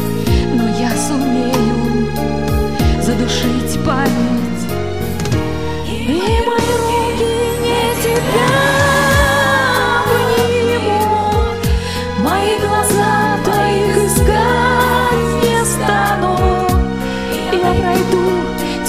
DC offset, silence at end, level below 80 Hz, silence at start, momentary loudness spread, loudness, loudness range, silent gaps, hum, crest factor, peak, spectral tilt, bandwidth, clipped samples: 2%; 0 s; -26 dBFS; 0 s; 6 LU; -14 LUFS; 4 LU; none; none; 14 dB; 0 dBFS; -5 dB/octave; 16 kHz; under 0.1%